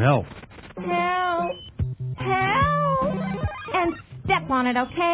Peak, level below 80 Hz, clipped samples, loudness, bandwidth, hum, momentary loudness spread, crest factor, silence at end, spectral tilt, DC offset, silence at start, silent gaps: -6 dBFS; -42 dBFS; under 0.1%; -24 LUFS; 4 kHz; none; 11 LU; 18 dB; 0 s; -10 dB/octave; under 0.1%; 0 s; none